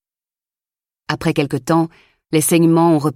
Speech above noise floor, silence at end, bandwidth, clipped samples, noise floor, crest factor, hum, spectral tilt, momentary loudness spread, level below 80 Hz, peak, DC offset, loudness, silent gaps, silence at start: over 75 dB; 0.05 s; 16.5 kHz; under 0.1%; under -90 dBFS; 14 dB; none; -5.5 dB/octave; 9 LU; -52 dBFS; -4 dBFS; under 0.1%; -16 LUFS; none; 1.1 s